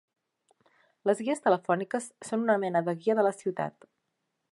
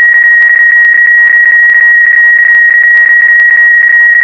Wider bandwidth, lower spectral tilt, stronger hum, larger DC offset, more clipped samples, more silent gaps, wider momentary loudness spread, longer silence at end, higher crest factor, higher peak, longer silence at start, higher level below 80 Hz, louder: first, 11.5 kHz vs 5.4 kHz; first, -6 dB/octave vs -1.5 dB/octave; neither; second, under 0.1% vs 0.3%; second, under 0.1% vs 1%; neither; first, 8 LU vs 0 LU; first, 0.8 s vs 0 s; first, 20 dB vs 4 dB; second, -10 dBFS vs 0 dBFS; first, 1.05 s vs 0 s; second, -84 dBFS vs -60 dBFS; second, -29 LUFS vs -2 LUFS